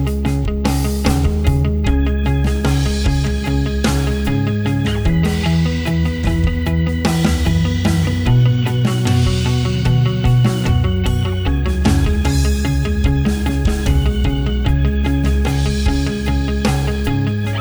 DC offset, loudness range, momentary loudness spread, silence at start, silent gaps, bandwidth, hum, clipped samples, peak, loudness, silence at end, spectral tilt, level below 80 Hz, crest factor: under 0.1%; 2 LU; 3 LU; 0 s; none; over 20 kHz; none; under 0.1%; -2 dBFS; -17 LUFS; 0 s; -6.5 dB/octave; -20 dBFS; 14 dB